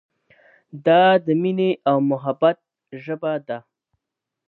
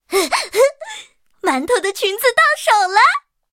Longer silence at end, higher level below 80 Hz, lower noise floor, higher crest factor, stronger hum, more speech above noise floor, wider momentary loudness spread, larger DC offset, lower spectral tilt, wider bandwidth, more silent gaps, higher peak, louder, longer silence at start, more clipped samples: first, 0.9 s vs 0.35 s; second, -76 dBFS vs -60 dBFS; first, -84 dBFS vs -39 dBFS; about the same, 18 dB vs 16 dB; neither; first, 65 dB vs 24 dB; first, 18 LU vs 12 LU; neither; first, -9.5 dB/octave vs -0.5 dB/octave; second, 4.4 kHz vs 17 kHz; neither; second, -4 dBFS vs 0 dBFS; second, -19 LUFS vs -15 LUFS; first, 0.75 s vs 0.1 s; neither